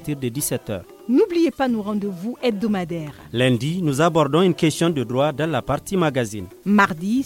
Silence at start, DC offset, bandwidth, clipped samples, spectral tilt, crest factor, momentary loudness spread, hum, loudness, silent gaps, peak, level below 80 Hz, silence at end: 0 s; under 0.1%; 17 kHz; under 0.1%; -5.5 dB/octave; 18 dB; 11 LU; none; -21 LUFS; none; -2 dBFS; -52 dBFS; 0 s